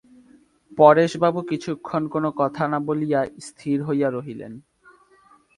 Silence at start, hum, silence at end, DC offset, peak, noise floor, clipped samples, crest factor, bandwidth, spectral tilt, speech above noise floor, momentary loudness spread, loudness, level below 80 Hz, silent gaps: 0.7 s; none; 0.95 s; under 0.1%; 0 dBFS; -56 dBFS; under 0.1%; 22 dB; 11.5 kHz; -7 dB/octave; 35 dB; 19 LU; -21 LUFS; -64 dBFS; none